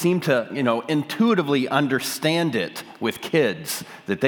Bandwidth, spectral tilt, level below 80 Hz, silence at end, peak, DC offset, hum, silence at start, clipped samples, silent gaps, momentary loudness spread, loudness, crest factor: 19.5 kHz; -5 dB/octave; -72 dBFS; 0 s; -4 dBFS; under 0.1%; none; 0 s; under 0.1%; none; 9 LU; -23 LUFS; 18 dB